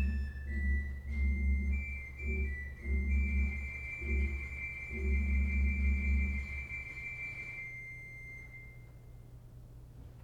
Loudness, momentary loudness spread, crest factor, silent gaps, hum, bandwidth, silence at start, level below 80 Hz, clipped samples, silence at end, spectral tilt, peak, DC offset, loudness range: -36 LUFS; 21 LU; 12 dB; none; none; 7 kHz; 0 s; -36 dBFS; under 0.1%; 0 s; -8 dB/octave; -22 dBFS; under 0.1%; 9 LU